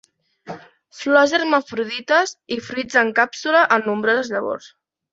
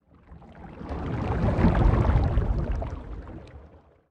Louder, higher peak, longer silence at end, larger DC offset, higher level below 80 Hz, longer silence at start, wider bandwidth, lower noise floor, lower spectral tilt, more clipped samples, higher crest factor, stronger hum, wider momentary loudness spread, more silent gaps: first, -19 LUFS vs -26 LUFS; first, -2 dBFS vs -8 dBFS; about the same, 0.45 s vs 0.45 s; neither; second, -66 dBFS vs -30 dBFS; first, 0.45 s vs 0.3 s; first, 8 kHz vs 6.4 kHz; second, -39 dBFS vs -52 dBFS; second, -3 dB/octave vs -9.5 dB/octave; neither; about the same, 20 dB vs 18 dB; neither; second, 16 LU vs 22 LU; neither